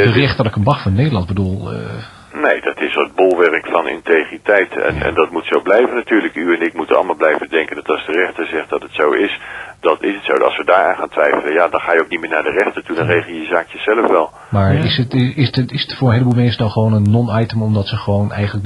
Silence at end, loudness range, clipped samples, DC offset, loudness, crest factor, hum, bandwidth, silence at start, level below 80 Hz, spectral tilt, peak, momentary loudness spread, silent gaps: 0 s; 2 LU; under 0.1%; under 0.1%; -15 LUFS; 14 dB; none; 11 kHz; 0 s; -44 dBFS; -7.5 dB/octave; 0 dBFS; 6 LU; none